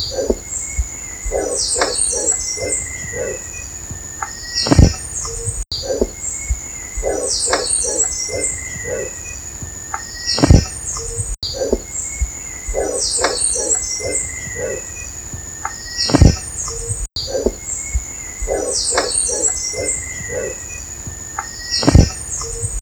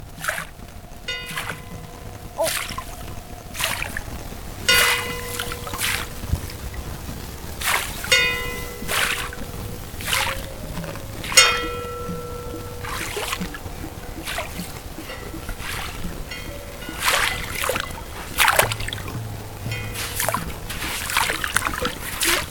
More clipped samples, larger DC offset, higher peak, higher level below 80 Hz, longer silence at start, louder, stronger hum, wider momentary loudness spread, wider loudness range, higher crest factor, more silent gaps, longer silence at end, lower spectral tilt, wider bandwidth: neither; neither; about the same, 0 dBFS vs 0 dBFS; first, -26 dBFS vs -38 dBFS; about the same, 0 s vs 0 s; first, -19 LUFS vs -23 LUFS; neither; second, 13 LU vs 17 LU; second, 1 LU vs 8 LU; second, 20 dB vs 26 dB; neither; about the same, 0 s vs 0 s; first, -3.5 dB/octave vs -2 dB/octave; about the same, 19.5 kHz vs 19 kHz